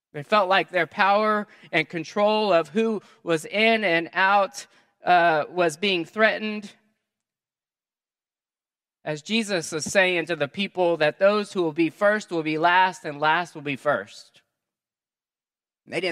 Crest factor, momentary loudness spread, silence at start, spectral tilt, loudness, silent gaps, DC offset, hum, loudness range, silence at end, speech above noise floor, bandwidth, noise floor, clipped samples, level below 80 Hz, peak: 22 dB; 9 LU; 0.15 s; -4 dB/octave; -23 LUFS; none; under 0.1%; none; 7 LU; 0 s; over 67 dB; 14 kHz; under -90 dBFS; under 0.1%; -76 dBFS; -2 dBFS